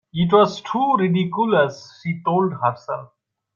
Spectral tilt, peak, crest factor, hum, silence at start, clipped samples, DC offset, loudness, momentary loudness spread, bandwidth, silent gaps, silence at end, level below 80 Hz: -7 dB/octave; -4 dBFS; 16 dB; none; 0.15 s; under 0.1%; under 0.1%; -20 LUFS; 14 LU; 7.2 kHz; none; 0.5 s; -62 dBFS